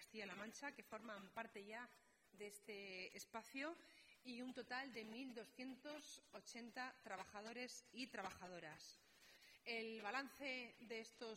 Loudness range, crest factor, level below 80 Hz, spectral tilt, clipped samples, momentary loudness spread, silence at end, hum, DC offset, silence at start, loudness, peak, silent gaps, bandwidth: 3 LU; 22 dB; -88 dBFS; -2.5 dB/octave; under 0.1%; 10 LU; 0 s; none; under 0.1%; 0 s; -53 LUFS; -32 dBFS; none; 16 kHz